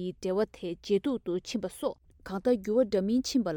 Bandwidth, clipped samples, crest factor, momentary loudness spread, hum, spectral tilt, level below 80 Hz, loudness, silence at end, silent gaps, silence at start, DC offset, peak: 18 kHz; under 0.1%; 16 dB; 9 LU; none; -5.5 dB/octave; -58 dBFS; -30 LUFS; 0 s; none; 0 s; under 0.1%; -14 dBFS